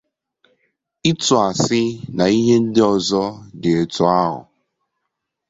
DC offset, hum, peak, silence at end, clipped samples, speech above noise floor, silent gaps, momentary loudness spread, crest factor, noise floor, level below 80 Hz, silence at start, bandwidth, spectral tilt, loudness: under 0.1%; none; -2 dBFS; 1.1 s; under 0.1%; 61 dB; none; 8 LU; 18 dB; -77 dBFS; -52 dBFS; 1.05 s; 8 kHz; -5 dB/octave; -17 LUFS